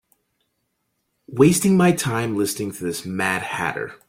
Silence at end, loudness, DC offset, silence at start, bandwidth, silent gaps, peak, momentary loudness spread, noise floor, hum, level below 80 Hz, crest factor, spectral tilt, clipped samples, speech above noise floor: 0.15 s; -20 LUFS; under 0.1%; 1.3 s; 16.5 kHz; none; -2 dBFS; 11 LU; -73 dBFS; none; -56 dBFS; 20 dB; -5 dB/octave; under 0.1%; 53 dB